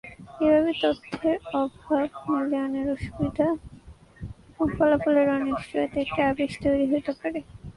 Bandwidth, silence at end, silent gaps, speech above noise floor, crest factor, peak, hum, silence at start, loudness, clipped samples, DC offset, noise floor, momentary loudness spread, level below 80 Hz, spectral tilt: 11 kHz; 0.05 s; none; 24 dB; 16 dB; -10 dBFS; none; 0.05 s; -25 LUFS; under 0.1%; under 0.1%; -48 dBFS; 11 LU; -48 dBFS; -7 dB/octave